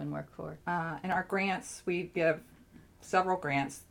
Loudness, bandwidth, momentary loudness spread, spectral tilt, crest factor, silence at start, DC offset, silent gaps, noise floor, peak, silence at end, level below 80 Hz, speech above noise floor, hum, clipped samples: -33 LUFS; 18.5 kHz; 10 LU; -5.5 dB/octave; 20 dB; 0 s; under 0.1%; none; -57 dBFS; -14 dBFS; 0.1 s; -64 dBFS; 24 dB; none; under 0.1%